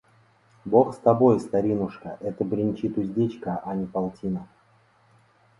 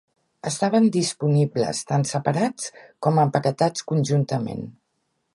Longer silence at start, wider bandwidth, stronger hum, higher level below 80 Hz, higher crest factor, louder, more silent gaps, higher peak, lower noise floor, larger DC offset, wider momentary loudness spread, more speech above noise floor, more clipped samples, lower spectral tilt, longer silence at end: first, 0.65 s vs 0.45 s; about the same, 11.5 kHz vs 11.5 kHz; neither; first, -58 dBFS vs -64 dBFS; about the same, 20 dB vs 18 dB; second, -25 LUFS vs -22 LUFS; neither; about the same, -4 dBFS vs -4 dBFS; second, -61 dBFS vs -73 dBFS; neither; about the same, 13 LU vs 13 LU; second, 37 dB vs 51 dB; neither; first, -9.5 dB/octave vs -6 dB/octave; first, 1.15 s vs 0.65 s